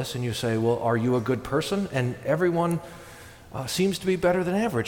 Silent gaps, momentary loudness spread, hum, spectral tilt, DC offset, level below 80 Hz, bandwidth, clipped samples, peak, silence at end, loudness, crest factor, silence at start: none; 14 LU; none; -6 dB/octave; under 0.1%; -54 dBFS; 18 kHz; under 0.1%; -12 dBFS; 0 s; -25 LUFS; 14 dB; 0 s